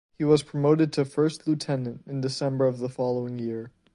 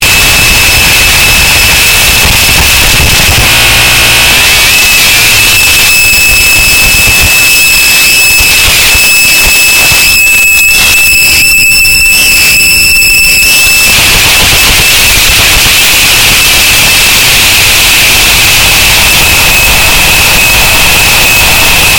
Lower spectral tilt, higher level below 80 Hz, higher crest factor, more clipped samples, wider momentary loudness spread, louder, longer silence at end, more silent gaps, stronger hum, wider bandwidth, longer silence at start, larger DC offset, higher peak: first, -7 dB/octave vs -0.5 dB/octave; second, -66 dBFS vs -18 dBFS; first, 18 dB vs 4 dB; second, under 0.1% vs 4%; first, 10 LU vs 1 LU; second, -26 LUFS vs -1 LUFS; first, 0.25 s vs 0 s; neither; neither; second, 11 kHz vs over 20 kHz; first, 0.2 s vs 0 s; second, under 0.1% vs 3%; second, -8 dBFS vs 0 dBFS